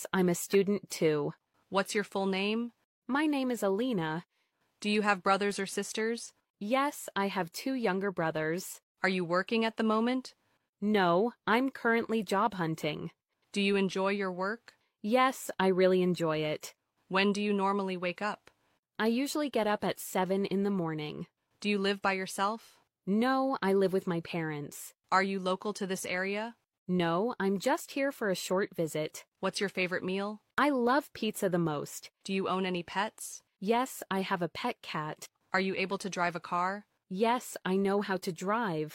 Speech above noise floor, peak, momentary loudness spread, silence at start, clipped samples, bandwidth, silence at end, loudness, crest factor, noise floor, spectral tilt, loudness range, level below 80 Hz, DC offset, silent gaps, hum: 45 dB; -12 dBFS; 10 LU; 0 s; under 0.1%; 16.5 kHz; 0 s; -31 LUFS; 20 dB; -76 dBFS; -5 dB/octave; 3 LU; -74 dBFS; under 0.1%; 2.84-3.02 s, 6.50-6.54 s, 8.83-8.95 s, 10.69-10.73 s, 18.79-18.83 s, 26.78-26.86 s, 29.28-29.32 s; none